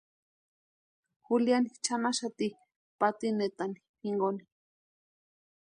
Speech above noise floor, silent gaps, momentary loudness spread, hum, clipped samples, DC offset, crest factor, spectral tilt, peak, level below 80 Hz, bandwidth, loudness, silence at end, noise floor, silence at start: over 60 dB; 2.76-2.99 s, 3.89-3.94 s; 10 LU; none; under 0.1%; under 0.1%; 20 dB; -4 dB/octave; -14 dBFS; -82 dBFS; 10.5 kHz; -32 LUFS; 1.2 s; under -90 dBFS; 1.3 s